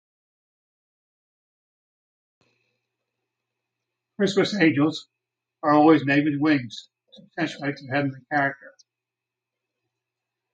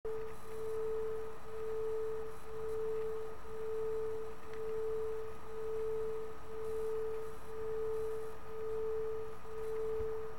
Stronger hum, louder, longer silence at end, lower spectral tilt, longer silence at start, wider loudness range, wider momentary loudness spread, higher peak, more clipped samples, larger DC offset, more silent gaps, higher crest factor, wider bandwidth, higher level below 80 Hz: neither; first, -22 LUFS vs -41 LUFS; first, 1.85 s vs 0 s; about the same, -6 dB/octave vs -6 dB/octave; first, 4.2 s vs 0.05 s; first, 8 LU vs 0 LU; first, 19 LU vs 6 LU; first, -6 dBFS vs -28 dBFS; neither; second, under 0.1% vs 1%; neither; first, 22 dB vs 10 dB; second, 8.4 kHz vs 16 kHz; second, -72 dBFS vs -60 dBFS